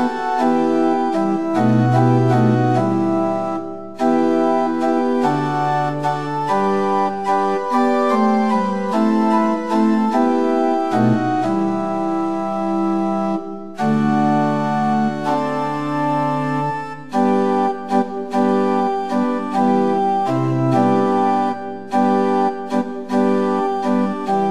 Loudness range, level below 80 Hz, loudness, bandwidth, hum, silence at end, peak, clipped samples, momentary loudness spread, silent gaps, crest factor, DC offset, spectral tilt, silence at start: 3 LU; -66 dBFS; -18 LUFS; 11.5 kHz; none; 0 s; -4 dBFS; under 0.1%; 6 LU; none; 14 dB; 1%; -8 dB/octave; 0 s